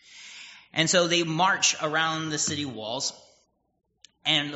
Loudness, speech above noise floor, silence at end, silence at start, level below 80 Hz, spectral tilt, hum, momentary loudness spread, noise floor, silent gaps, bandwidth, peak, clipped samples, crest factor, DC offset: -25 LUFS; 41 dB; 0 s; 0.1 s; -70 dBFS; -1.5 dB/octave; none; 18 LU; -67 dBFS; none; 8 kHz; -6 dBFS; under 0.1%; 20 dB; under 0.1%